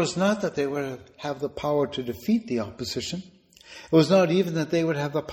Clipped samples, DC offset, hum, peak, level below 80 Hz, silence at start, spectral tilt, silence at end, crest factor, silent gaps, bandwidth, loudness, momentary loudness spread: under 0.1%; under 0.1%; none; -6 dBFS; -58 dBFS; 0 s; -6 dB/octave; 0 s; 20 dB; none; 17 kHz; -25 LUFS; 14 LU